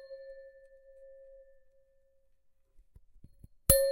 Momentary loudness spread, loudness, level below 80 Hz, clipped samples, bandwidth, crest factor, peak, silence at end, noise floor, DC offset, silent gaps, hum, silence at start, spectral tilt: 30 LU; -27 LUFS; -46 dBFS; under 0.1%; 16 kHz; 30 dB; -6 dBFS; 0 s; -67 dBFS; under 0.1%; none; none; 0.1 s; -3 dB/octave